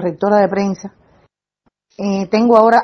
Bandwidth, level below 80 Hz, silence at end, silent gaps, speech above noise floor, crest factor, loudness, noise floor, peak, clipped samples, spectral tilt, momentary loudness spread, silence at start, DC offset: 7.6 kHz; -58 dBFS; 0 s; none; 52 dB; 16 dB; -15 LUFS; -65 dBFS; 0 dBFS; 0.1%; -7 dB/octave; 16 LU; 0 s; under 0.1%